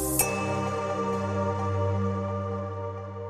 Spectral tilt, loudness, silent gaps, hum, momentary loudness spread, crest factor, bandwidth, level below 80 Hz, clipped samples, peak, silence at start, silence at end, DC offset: -5 dB/octave; -29 LUFS; none; none; 8 LU; 20 dB; 15.5 kHz; -50 dBFS; under 0.1%; -10 dBFS; 0 s; 0 s; under 0.1%